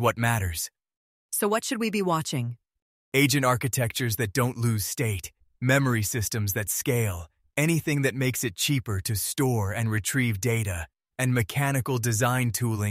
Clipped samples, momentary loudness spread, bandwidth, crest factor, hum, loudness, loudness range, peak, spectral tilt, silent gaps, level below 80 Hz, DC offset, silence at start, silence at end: under 0.1%; 8 LU; 16 kHz; 20 dB; none; -26 LUFS; 1 LU; -6 dBFS; -4.5 dB/octave; 0.97-1.29 s, 2.82-3.12 s; -52 dBFS; under 0.1%; 0 s; 0 s